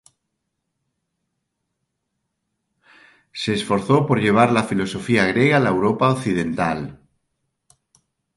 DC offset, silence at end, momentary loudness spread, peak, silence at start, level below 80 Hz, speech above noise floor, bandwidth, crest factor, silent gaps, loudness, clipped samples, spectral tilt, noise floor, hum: under 0.1%; 1.4 s; 9 LU; -2 dBFS; 3.35 s; -54 dBFS; 59 dB; 11.5 kHz; 20 dB; none; -19 LUFS; under 0.1%; -6 dB/octave; -77 dBFS; none